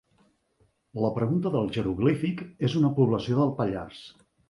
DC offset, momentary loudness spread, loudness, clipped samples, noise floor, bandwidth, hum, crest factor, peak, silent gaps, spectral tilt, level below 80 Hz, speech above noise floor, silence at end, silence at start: under 0.1%; 11 LU; -26 LUFS; under 0.1%; -68 dBFS; 11.5 kHz; none; 18 dB; -10 dBFS; none; -8.5 dB/octave; -54 dBFS; 42 dB; 0.4 s; 0.95 s